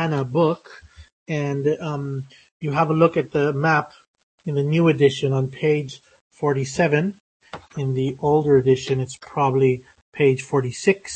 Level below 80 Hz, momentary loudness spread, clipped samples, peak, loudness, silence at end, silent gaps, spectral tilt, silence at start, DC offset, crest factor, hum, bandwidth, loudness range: -56 dBFS; 14 LU; under 0.1%; -2 dBFS; -21 LUFS; 0 s; 1.12-1.26 s, 2.51-2.60 s, 4.07-4.14 s, 4.23-4.38 s, 6.21-6.31 s, 7.20-7.40 s, 10.02-10.12 s; -6.5 dB/octave; 0 s; under 0.1%; 18 dB; none; 8.8 kHz; 3 LU